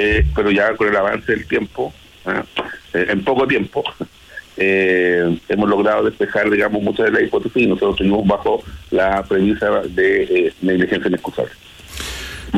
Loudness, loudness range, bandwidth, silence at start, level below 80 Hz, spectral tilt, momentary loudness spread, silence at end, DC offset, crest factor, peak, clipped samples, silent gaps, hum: -17 LUFS; 3 LU; 15 kHz; 0 s; -34 dBFS; -6 dB/octave; 11 LU; 0 s; under 0.1%; 12 dB; -4 dBFS; under 0.1%; none; none